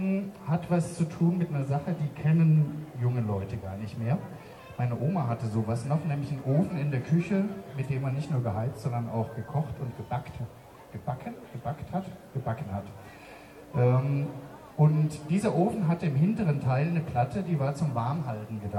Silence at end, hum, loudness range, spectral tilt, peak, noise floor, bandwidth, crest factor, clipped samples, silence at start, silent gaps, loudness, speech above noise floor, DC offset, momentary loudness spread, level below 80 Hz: 0 s; none; 9 LU; -8.5 dB/octave; -12 dBFS; -48 dBFS; 12 kHz; 16 dB; under 0.1%; 0 s; none; -29 LUFS; 20 dB; under 0.1%; 13 LU; -58 dBFS